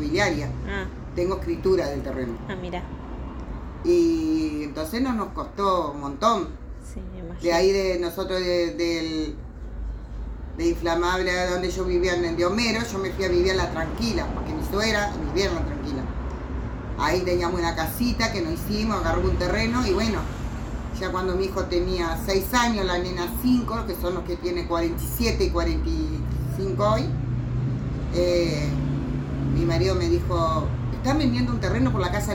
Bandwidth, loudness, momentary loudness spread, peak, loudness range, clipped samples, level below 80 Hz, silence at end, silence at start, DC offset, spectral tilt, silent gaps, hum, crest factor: over 20 kHz; -25 LUFS; 10 LU; -8 dBFS; 3 LU; under 0.1%; -32 dBFS; 0 s; 0 s; under 0.1%; -5.5 dB/octave; none; none; 18 dB